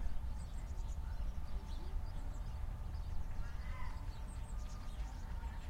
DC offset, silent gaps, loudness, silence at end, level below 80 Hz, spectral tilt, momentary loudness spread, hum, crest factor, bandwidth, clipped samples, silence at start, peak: under 0.1%; none; -47 LUFS; 0 s; -42 dBFS; -6 dB/octave; 2 LU; none; 14 dB; 14.5 kHz; under 0.1%; 0 s; -26 dBFS